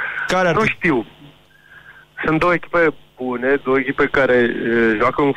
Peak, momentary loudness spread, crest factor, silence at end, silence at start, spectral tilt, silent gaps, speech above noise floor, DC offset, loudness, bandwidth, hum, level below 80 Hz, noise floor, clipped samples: -2 dBFS; 9 LU; 16 dB; 0 s; 0 s; -6 dB/octave; none; 30 dB; under 0.1%; -17 LUFS; 11 kHz; none; -44 dBFS; -47 dBFS; under 0.1%